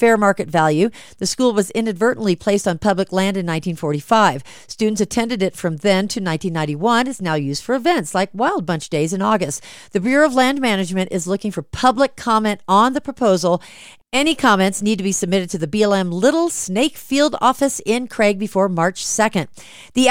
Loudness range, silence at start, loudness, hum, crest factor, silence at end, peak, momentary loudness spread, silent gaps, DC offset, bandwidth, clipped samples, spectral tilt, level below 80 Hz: 2 LU; 0 s; -18 LUFS; none; 18 dB; 0 s; 0 dBFS; 7 LU; none; under 0.1%; 16.5 kHz; under 0.1%; -4.5 dB/octave; -50 dBFS